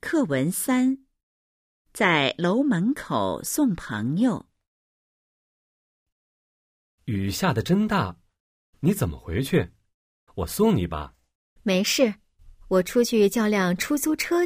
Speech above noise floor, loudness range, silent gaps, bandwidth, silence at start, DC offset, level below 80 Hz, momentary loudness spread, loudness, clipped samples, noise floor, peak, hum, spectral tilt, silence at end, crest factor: over 67 dB; 6 LU; 1.23-1.85 s, 4.67-6.06 s, 6.12-6.98 s, 8.40-8.73 s, 9.94-10.27 s, 11.35-11.56 s; 16 kHz; 0.05 s; under 0.1%; -48 dBFS; 12 LU; -24 LUFS; under 0.1%; under -90 dBFS; -6 dBFS; none; -5 dB/octave; 0 s; 18 dB